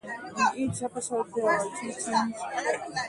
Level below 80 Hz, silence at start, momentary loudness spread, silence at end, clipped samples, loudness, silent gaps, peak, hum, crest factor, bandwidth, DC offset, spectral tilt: -66 dBFS; 0.05 s; 7 LU; 0 s; under 0.1%; -29 LUFS; none; -12 dBFS; none; 16 dB; 11.5 kHz; under 0.1%; -3.5 dB/octave